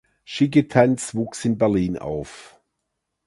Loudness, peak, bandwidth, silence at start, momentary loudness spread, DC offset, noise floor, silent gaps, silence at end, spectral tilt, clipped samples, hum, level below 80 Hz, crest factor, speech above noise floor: -21 LUFS; 0 dBFS; 11.5 kHz; 0.3 s; 13 LU; under 0.1%; -78 dBFS; none; 0.8 s; -6 dB/octave; under 0.1%; none; -50 dBFS; 22 dB; 57 dB